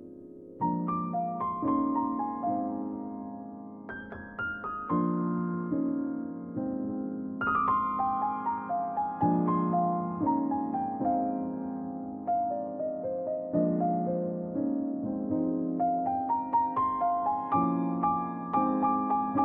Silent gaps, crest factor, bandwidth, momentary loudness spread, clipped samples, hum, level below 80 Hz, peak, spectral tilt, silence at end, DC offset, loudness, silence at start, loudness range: none; 14 dB; 3.6 kHz; 10 LU; under 0.1%; none; -66 dBFS; -16 dBFS; -9 dB/octave; 0 s; under 0.1%; -30 LUFS; 0 s; 4 LU